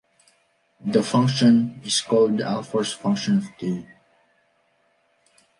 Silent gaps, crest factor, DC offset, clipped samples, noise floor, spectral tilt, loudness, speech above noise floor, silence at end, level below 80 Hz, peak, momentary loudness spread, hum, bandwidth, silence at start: none; 18 dB; under 0.1%; under 0.1%; -65 dBFS; -5.5 dB/octave; -22 LUFS; 45 dB; 1.75 s; -66 dBFS; -6 dBFS; 12 LU; none; 11.5 kHz; 0.85 s